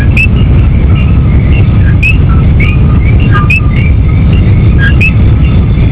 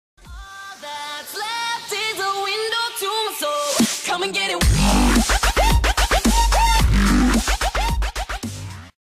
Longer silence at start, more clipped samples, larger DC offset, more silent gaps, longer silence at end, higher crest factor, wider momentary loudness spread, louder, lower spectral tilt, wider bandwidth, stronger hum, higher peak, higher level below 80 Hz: second, 0 s vs 0.25 s; first, 0.2% vs under 0.1%; first, 2% vs under 0.1%; neither; about the same, 0 s vs 0.1 s; second, 4 dB vs 14 dB; second, 2 LU vs 14 LU; first, -6 LUFS vs -19 LUFS; first, -11.5 dB/octave vs -3.5 dB/octave; second, 4 kHz vs 15.5 kHz; neither; first, 0 dBFS vs -6 dBFS; first, -8 dBFS vs -24 dBFS